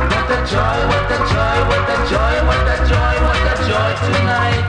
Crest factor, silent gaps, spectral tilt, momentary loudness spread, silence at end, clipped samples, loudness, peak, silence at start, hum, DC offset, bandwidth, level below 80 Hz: 12 dB; none; -5.5 dB/octave; 1 LU; 0 s; under 0.1%; -15 LUFS; -2 dBFS; 0 s; none; under 0.1%; 10.5 kHz; -20 dBFS